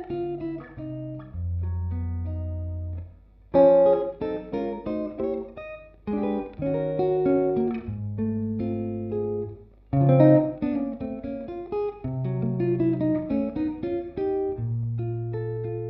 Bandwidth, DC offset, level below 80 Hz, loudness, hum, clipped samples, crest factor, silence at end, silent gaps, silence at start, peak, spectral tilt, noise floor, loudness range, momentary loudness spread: 5.4 kHz; under 0.1%; -46 dBFS; -26 LUFS; none; under 0.1%; 20 dB; 0 s; none; 0 s; -4 dBFS; -10 dB/octave; -48 dBFS; 4 LU; 15 LU